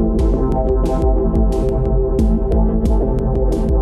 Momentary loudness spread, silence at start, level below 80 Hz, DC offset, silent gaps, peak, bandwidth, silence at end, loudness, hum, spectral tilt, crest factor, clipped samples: 2 LU; 0 s; -16 dBFS; under 0.1%; none; -4 dBFS; 7 kHz; 0 s; -17 LUFS; none; -9.5 dB/octave; 10 dB; under 0.1%